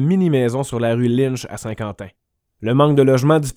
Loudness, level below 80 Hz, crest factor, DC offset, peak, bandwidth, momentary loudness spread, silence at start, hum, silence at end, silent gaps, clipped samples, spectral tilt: -17 LUFS; -50 dBFS; 16 dB; under 0.1%; 0 dBFS; 16 kHz; 15 LU; 0 s; none; 0.05 s; none; under 0.1%; -7 dB/octave